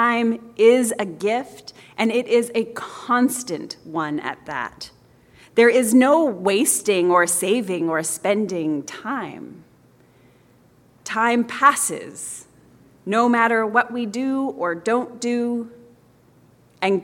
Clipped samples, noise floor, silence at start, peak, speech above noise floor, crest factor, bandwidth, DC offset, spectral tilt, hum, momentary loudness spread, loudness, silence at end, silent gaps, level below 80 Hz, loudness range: under 0.1%; -54 dBFS; 0 s; -2 dBFS; 34 dB; 18 dB; 17 kHz; under 0.1%; -3.5 dB/octave; none; 16 LU; -20 LUFS; 0 s; none; -66 dBFS; 7 LU